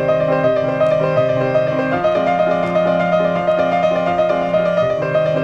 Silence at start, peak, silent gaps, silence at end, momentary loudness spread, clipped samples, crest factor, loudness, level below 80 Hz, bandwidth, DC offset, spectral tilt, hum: 0 s; -4 dBFS; none; 0 s; 1 LU; under 0.1%; 12 dB; -16 LUFS; -50 dBFS; 7.2 kHz; under 0.1%; -7.5 dB/octave; none